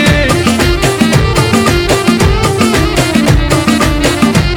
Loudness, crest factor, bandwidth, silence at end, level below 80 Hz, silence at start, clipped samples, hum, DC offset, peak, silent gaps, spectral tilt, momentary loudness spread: -10 LUFS; 10 dB; 18.5 kHz; 0 s; -18 dBFS; 0 s; 0.2%; none; under 0.1%; 0 dBFS; none; -5 dB/octave; 1 LU